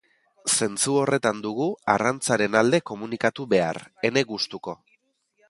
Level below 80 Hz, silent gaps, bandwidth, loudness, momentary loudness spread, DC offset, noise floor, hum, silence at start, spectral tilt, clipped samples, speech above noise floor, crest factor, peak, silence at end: -64 dBFS; none; 11.5 kHz; -24 LUFS; 9 LU; under 0.1%; -68 dBFS; none; 0.45 s; -3.5 dB/octave; under 0.1%; 44 dB; 22 dB; -2 dBFS; 0.75 s